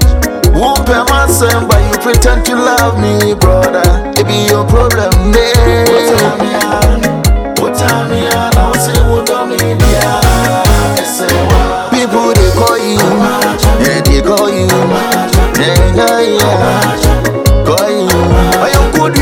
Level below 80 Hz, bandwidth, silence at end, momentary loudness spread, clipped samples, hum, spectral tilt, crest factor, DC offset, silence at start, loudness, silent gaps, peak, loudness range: -14 dBFS; 19.5 kHz; 0 s; 3 LU; 0.2%; none; -5 dB/octave; 8 dB; 0.1%; 0 s; -9 LUFS; none; 0 dBFS; 1 LU